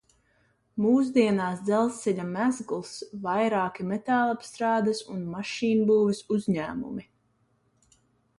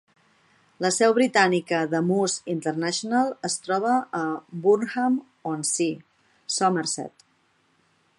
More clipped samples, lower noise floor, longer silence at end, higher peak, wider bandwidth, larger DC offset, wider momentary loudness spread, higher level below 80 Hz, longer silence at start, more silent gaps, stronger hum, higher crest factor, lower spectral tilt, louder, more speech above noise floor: neither; about the same, -69 dBFS vs -66 dBFS; first, 1.35 s vs 1.1 s; second, -10 dBFS vs -4 dBFS; about the same, 11.5 kHz vs 11.5 kHz; neither; first, 12 LU vs 9 LU; first, -66 dBFS vs -76 dBFS; about the same, 0.75 s vs 0.8 s; neither; neither; about the same, 18 dB vs 20 dB; first, -6 dB/octave vs -4 dB/octave; second, -27 LUFS vs -24 LUFS; about the same, 43 dB vs 42 dB